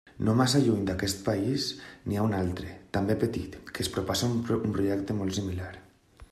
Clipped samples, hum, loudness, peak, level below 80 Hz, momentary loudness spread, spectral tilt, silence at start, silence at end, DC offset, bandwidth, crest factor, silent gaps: under 0.1%; none; -29 LUFS; -12 dBFS; -54 dBFS; 12 LU; -5.5 dB/octave; 0.15 s; 0.05 s; under 0.1%; 14.5 kHz; 18 dB; none